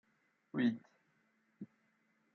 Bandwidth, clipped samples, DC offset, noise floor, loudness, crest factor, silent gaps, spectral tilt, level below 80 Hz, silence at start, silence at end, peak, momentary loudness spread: 6.4 kHz; under 0.1%; under 0.1%; -77 dBFS; -38 LUFS; 20 dB; none; -5.5 dB/octave; -90 dBFS; 0.55 s; 0.7 s; -24 dBFS; 20 LU